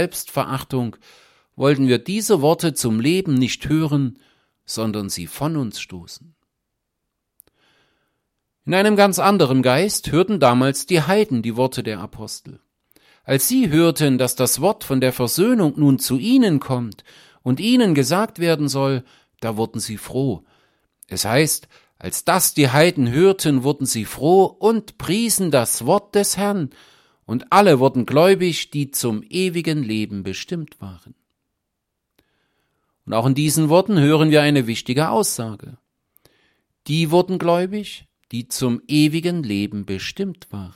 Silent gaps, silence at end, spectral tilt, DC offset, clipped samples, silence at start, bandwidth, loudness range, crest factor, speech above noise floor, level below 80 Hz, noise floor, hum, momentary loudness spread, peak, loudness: none; 0.05 s; -5 dB/octave; under 0.1%; under 0.1%; 0 s; 16.5 kHz; 8 LU; 18 dB; 59 dB; -54 dBFS; -78 dBFS; none; 14 LU; -2 dBFS; -18 LUFS